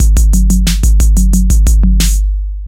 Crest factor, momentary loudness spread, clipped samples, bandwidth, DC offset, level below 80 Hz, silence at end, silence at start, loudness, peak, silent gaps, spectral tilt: 8 dB; 3 LU; under 0.1%; 16 kHz; under 0.1%; -8 dBFS; 0 s; 0 s; -11 LUFS; 0 dBFS; none; -5 dB/octave